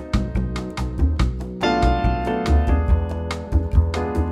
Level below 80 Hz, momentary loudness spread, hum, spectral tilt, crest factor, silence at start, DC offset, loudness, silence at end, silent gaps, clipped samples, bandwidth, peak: -22 dBFS; 7 LU; none; -7 dB/octave; 14 dB; 0 s; under 0.1%; -22 LUFS; 0 s; none; under 0.1%; 10 kHz; -6 dBFS